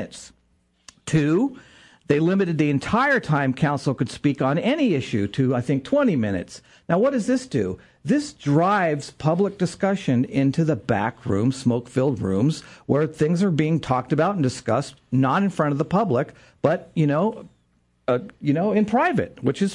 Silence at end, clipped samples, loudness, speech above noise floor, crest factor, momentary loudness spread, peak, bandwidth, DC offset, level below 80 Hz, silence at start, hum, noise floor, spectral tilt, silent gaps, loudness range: 0 s; under 0.1%; -22 LUFS; 43 dB; 18 dB; 6 LU; -4 dBFS; 11 kHz; under 0.1%; -56 dBFS; 0 s; none; -64 dBFS; -7 dB/octave; none; 2 LU